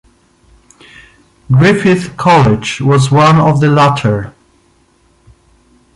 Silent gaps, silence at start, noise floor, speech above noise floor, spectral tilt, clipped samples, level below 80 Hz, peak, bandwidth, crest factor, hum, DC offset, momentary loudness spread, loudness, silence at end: none; 1.5 s; -51 dBFS; 43 dB; -6.5 dB/octave; under 0.1%; -40 dBFS; 0 dBFS; 11.5 kHz; 12 dB; none; under 0.1%; 7 LU; -10 LUFS; 1.65 s